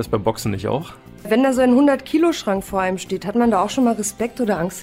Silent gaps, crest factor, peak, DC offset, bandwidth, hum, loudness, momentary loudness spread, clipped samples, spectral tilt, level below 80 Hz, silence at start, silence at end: none; 14 dB; -4 dBFS; under 0.1%; 16 kHz; none; -19 LUFS; 9 LU; under 0.1%; -5.5 dB/octave; -46 dBFS; 0 s; 0 s